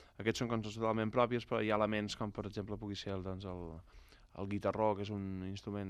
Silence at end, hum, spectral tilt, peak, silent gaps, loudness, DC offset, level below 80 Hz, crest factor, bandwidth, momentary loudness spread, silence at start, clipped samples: 0 s; none; -6 dB/octave; -16 dBFS; none; -38 LUFS; under 0.1%; -60 dBFS; 22 dB; 14 kHz; 12 LU; 0 s; under 0.1%